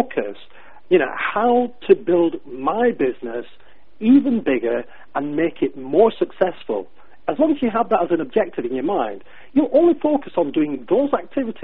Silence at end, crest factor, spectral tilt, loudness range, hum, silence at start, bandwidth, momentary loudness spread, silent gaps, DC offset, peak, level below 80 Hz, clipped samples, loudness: 0.1 s; 18 dB; -10.5 dB/octave; 2 LU; none; 0 s; 4.1 kHz; 12 LU; none; 1%; -2 dBFS; -58 dBFS; under 0.1%; -20 LUFS